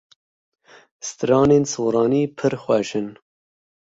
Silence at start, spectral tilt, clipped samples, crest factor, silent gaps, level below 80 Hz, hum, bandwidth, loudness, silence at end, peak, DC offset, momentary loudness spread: 1.05 s; -6 dB/octave; under 0.1%; 18 dB; none; -56 dBFS; none; 7.8 kHz; -20 LUFS; 0.65 s; -4 dBFS; under 0.1%; 16 LU